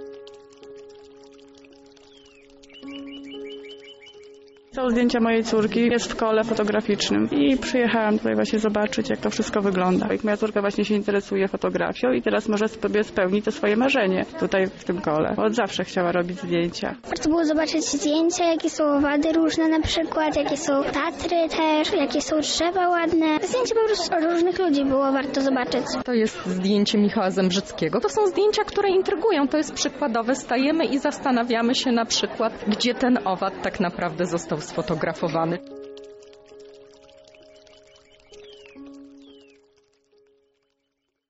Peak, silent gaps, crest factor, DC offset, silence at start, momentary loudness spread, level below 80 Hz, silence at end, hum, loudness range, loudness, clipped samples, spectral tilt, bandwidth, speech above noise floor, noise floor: -10 dBFS; none; 14 dB; under 0.1%; 0 s; 7 LU; -52 dBFS; 2 s; none; 7 LU; -22 LUFS; under 0.1%; -4 dB/octave; 8 kHz; 55 dB; -77 dBFS